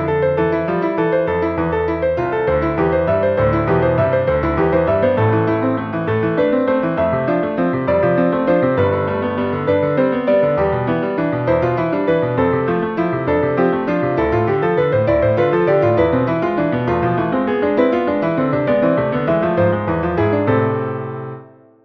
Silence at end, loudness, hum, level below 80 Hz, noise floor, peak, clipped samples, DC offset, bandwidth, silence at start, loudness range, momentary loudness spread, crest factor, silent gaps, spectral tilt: 0.4 s; -17 LUFS; none; -38 dBFS; -39 dBFS; -2 dBFS; under 0.1%; under 0.1%; 5.8 kHz; 0 s; 1 LU; 4 LU; 14 dB; none; -10 dB/octave